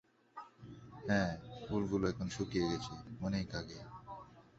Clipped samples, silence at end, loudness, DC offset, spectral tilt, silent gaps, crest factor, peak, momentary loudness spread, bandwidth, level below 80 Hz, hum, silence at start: under 0.1%; 0.15 s; -38 LUFS; under 0.1%; -5.5 dB/octave; none; 20 dB; -18 dBFS; 19 LU; 8 kHz; -58 dBFS; none; 0.35 s